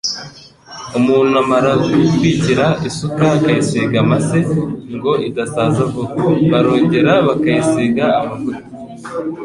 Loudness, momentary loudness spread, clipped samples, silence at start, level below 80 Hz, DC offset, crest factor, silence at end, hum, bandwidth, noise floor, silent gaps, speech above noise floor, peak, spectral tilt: -15 LUFS; 12 LU; under 0.1%; 0.05 s; -46 dBFS; under 0.1%; 14 dB; 0 s; none; 11.5 kHz; -37 dBFS; none; 23 dB; -2 dBFS; -6.5 dB/octave